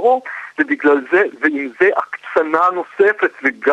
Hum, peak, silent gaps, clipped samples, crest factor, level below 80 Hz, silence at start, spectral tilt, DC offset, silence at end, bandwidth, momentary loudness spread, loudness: none; -2 dBFS; none; under 0.1%; 14 dB; -66 dBFS; 0 s; -5.5 dB/octave; under 0.1%; 0 s; 8.2 kHz; 6 LU; -16 LUFS